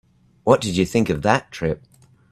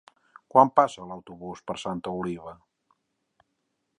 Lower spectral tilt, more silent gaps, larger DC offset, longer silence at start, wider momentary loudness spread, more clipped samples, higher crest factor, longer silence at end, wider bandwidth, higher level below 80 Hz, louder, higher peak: about the same, -5.5 dB/octave vs -6 dB/octave; neither; neither; about the same, 0.45 s vs 0.55 s; second, 9 LU vs 21 LU; neither; about the same, 22 dB vs 26 dB; second, 0.55 s vs 1.45 s; first, 14.5 kHz vs 10.5 kHz; first, -48 dBFS vs -64 dBFS; first, -20 LUFS vs -25 LUFS; about the same, 0 dBFS vs -2 dBFS